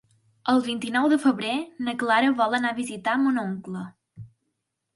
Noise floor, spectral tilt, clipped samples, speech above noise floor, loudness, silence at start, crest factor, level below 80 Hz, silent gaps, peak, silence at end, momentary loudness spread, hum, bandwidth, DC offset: -79 dBFS; -5 dB/octave; under 0.1%; 55 dB; -24 LUFS; 0.45 s; 16 dB; -68 dBFS; none; -8 dBFS; 0.7 s; 12 LU; none; 11.5 kHz; under 0.1%